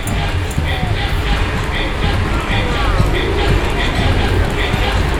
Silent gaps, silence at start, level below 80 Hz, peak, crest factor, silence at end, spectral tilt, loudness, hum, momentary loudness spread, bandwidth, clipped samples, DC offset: none; 0 s; -18 dBFS; 0 dBFS; 16 dB; 0 s; -5.5 dB/octave; -17 LUFS; none; 3 LU; 16.5 kHz; under 0.1%; under 0.1%